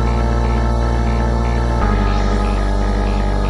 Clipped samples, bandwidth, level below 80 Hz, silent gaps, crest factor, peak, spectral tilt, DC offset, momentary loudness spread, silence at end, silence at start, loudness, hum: under 0.1%; 11 kHz; -16 dBFS; none; 12 dB; -4 dBFS; -7 dB/octave; under 0.1%; 2 LU; 0 s; 0 s; -18 LUFS; none